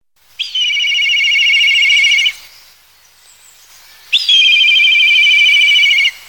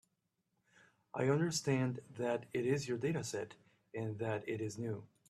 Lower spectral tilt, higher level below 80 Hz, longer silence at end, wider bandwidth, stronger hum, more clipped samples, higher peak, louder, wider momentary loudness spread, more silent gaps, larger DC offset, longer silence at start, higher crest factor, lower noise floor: second, 6 dB/octave vs -5.5 dB/octave; first, -62 dBFS vs -76 dBFS; second, 0.1 s vs 0.25 s; first, 19 kHz vs 13.5 kHz; first, 50 Hz at -65 dBFS vs none; neither; first, 0 dBFS vs -20 dBFS; first, -8 LUFS vs -38 LUFS; about the same, 8 LU vs 10 LU; neither; first, 0.2% vs under 0.1%; second, 0.4 s vs 1.15 s; second, 12 dB vs 18 dB; second, -47 dBFS vs -84 dBFS